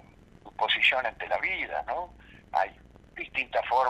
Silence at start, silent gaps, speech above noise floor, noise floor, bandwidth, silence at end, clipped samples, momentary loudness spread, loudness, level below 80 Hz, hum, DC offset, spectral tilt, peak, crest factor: 0.45 s; none; 24 dB; -52 dBFS; 13.5 kHz; 0 s; under 0.1%; 18 LU; -28 LUFS; -58 dBFS; none; under 0.1%; -3 dB/octave; -8 dBFS; 22 dB